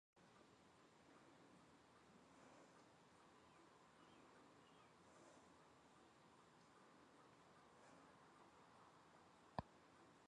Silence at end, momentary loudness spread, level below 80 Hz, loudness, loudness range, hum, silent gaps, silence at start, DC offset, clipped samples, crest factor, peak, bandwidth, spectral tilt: 0 s; 11 LU; -82 dBFS; -66 LUFS; 6 LU; none; none; 0.15 s; under 0.1%; under 0.1%; 36 dB; -30 dBFS; 10 kHz; -5 dB/octave